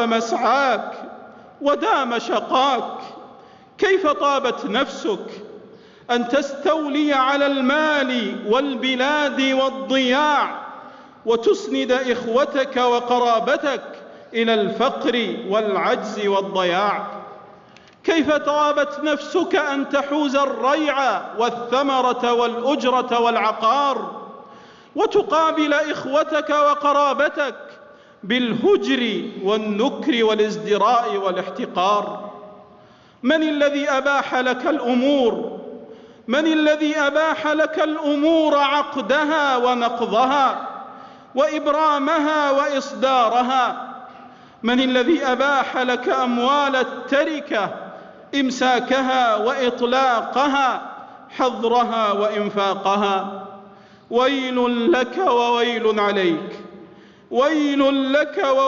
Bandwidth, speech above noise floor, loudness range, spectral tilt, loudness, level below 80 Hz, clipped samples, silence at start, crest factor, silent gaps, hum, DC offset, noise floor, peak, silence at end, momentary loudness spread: 7.6 kHz; 30 dB; 2 LU; -4 dB/octave; -19 LUFS; -64 dBFS; under 0.1%; 0 s; 12 dB; none; none; under 0.1%; -49 dBFS; -8 dBFS; 0 s; 10 LU